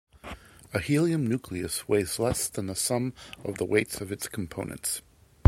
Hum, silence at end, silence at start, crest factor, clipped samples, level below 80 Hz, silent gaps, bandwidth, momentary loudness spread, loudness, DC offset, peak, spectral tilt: none; 0.5 s; 0.15 s; 24 dB; under 0.1%; -52 dBFS; none; 16.5 kHz; 12 LU; -29 LUFS; under 0.1%; -2 dBFS; -4.5 dB/octave